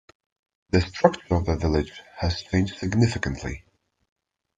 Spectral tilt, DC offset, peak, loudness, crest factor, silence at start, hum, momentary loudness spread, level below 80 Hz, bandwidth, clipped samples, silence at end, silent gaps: -6.5 dB/octave; under 0.1%; -2 dBFS; -25 LUFS; 24 dB; 0.75 s; none; 11 LU; -42 dBFS; 9.2 kHz; under 0.1%; 1 s; none